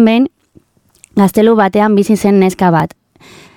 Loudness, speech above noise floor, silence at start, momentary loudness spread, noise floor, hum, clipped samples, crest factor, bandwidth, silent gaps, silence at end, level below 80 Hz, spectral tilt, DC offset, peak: -11 LUFS; 39 dB; 0 s; 8 LU; -49 dBFS; none; under 0.1%; 12 dB; 17 kHz; none; 0.7 s; -48 dBFS; -7 dB/octave; under 0.1%; 0 dBFS